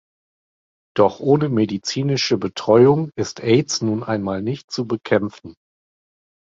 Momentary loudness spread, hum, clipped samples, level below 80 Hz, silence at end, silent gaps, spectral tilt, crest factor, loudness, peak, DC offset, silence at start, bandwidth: 11 LU; none; under 0.1%; -56 dBFS; 0.95 s; 4.64-4.68 s; -5.5 dB/octave; 18 dB; -19 LUFS; -2 dBFS; under 0.1%; 0.95 s; 7.8 kHz